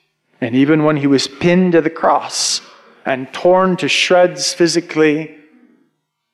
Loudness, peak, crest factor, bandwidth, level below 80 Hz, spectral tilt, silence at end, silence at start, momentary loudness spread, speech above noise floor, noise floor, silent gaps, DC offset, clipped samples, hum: -14 LUFS; -2 dBFS; 12 dB; 13 kHz; -58 dBFS; -4.5 dB/octave; 1.05 s; 0.4 s; 9 LU; 53 dB; -66 dBFS; none; under 0.1%; under 0.1%; none